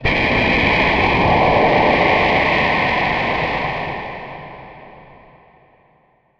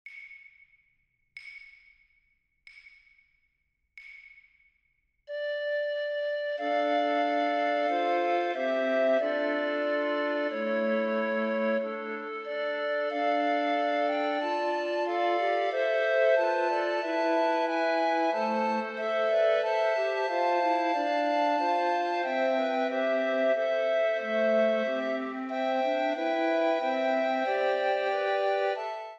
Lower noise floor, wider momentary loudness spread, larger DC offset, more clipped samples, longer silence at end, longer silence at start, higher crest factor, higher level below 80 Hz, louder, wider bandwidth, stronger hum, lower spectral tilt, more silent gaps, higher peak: second, -57 dBFS vs -77 dBFS; first, 15 LU vs 6 LU; neither; neither; first, 1.4 s vs 0 s; about the same, 0 s vs 0.05 s; about the same, 16 dB vs 16 dB; first, -34 dBFS vs -84 dBFS; first, -15 LUFS vs -28 LUFS; about the same, 8.4 kHz vs 8 kHz; neither; first, -6.5 dB/octave vs -4.5 dB/octave; neither; first, -2 dBFS vs -14 dBFS